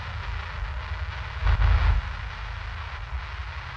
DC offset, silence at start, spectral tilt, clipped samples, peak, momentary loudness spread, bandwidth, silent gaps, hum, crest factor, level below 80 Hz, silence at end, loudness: under 0.1%; 0 s; -6 dB/octave; under 0.1%; -10 dBFS; 12 LU; 6.6 kHz; none; none; 16 dB; -28 dBFS; 0 s; -30 LUFS